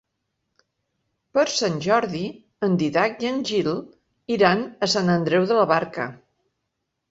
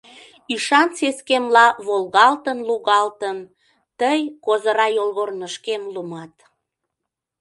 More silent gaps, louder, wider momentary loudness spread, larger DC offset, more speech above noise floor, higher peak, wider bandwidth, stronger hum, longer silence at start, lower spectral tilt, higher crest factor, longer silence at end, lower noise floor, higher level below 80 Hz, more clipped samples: neither; second, -22 LUFS vs -19 LUFS; second, 11 LU vs 14 LU; neither; second, 57 dB vs 63 dB; second, -4 dBFS vs 0 dBFS; second, 8 kHz vs 11.5 kHz; neither; first, 1.35 s vs 0.5 s; first, -5 dB/octave vs -2.5 dB/octave; about the same, 20 dB vs 20 dB; second, 0.95 s vs 1.15 s; second, -78 dBFS vs -82 dBFS; first, -62 dBFS vs -72 dBFS; neither